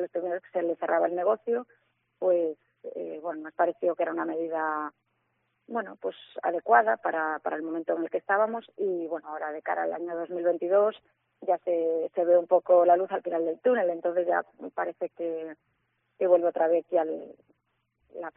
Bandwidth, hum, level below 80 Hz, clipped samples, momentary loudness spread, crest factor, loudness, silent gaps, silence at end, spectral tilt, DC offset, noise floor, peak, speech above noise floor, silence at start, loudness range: 3.9 kHz; none; -86 dBFS; under 0.1%; 13 LU; 22 dB; -28 LUFS; none; 0.05 s; -4 dB/octave; under 0.1%; -76 dBFS; -6 dBFS; 49 dB; 0 s; 5 LU